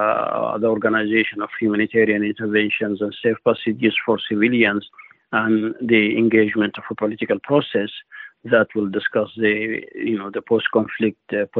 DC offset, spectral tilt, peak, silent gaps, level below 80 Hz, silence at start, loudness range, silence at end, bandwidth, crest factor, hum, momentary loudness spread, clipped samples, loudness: under 0.1%; -9 dB/octave; -4 dBFS; none; -64 dBFS; 0 s; 3 LU; 0 s; 4.2 kHz; 16 dB; none; 8 LU; under 0.1%; -20 LUFS